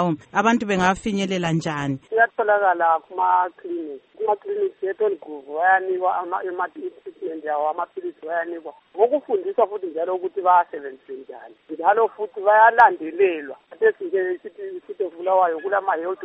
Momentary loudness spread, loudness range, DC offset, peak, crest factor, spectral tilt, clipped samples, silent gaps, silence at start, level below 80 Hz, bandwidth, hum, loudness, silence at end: 16 LU; 6 LU; under 0.1%; -2 dBFS; 20 dB; -6 dB/octave; under 0.1%; none; 0 s; -60 dBFS; 8.4 kHz; none; -21 LUFS; 0 s